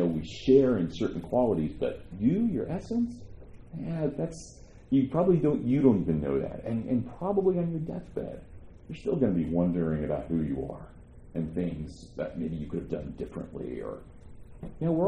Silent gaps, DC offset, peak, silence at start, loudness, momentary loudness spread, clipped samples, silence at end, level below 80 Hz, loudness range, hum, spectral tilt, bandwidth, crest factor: none; under 0.1%; -8 dBFS; 0 s; -29 LUFS; 16 LU; under 0.1%; 0 s; -48 dBFS; 9 LU; none; -8.5 dB/octave; 9.6 kHz; 20 dB